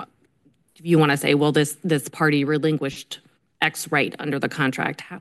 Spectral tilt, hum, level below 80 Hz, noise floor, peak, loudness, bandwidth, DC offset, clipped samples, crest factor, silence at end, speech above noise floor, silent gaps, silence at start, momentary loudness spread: -5 dB/octave; none; -66 dBFS; -62 dBFS; -4 dBFS; -21 LUFS; 12.5 kHz; under 0.1%; under 0.1%; 18 dB; 0 s; 41 dB; none; 0 s; 15 LU